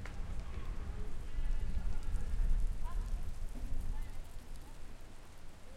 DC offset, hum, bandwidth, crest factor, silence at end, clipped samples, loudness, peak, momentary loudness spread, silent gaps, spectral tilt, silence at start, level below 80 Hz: under 0.1%; none; 11 kHz; 14 dB; 0 s; under 0.1%; -44 LUFS; -22 dBFS; 15 LU; none; -6 dB/octave; 0 s; -38 dBFS